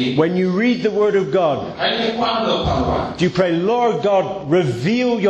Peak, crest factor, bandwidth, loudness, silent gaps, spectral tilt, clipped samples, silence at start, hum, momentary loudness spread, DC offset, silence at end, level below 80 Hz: -2 dBFS; 16 dB; 8.8 kHz; -18 LUFS; none; -6.5 dB/octave; under 0.1%; 0 s; none; 3 LU; under 0.1%; 0 s; -40 dBFS